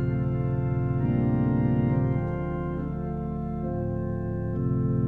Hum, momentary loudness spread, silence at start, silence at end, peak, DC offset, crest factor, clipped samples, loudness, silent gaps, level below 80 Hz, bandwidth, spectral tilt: none; 7 LU; 0 s; 0 s; -14 dBFS; under 0.1%; 12 dB; under 0.1%; -27 LUFS; none; -38 dBFS; 3.3 kHz; -12 dB/octave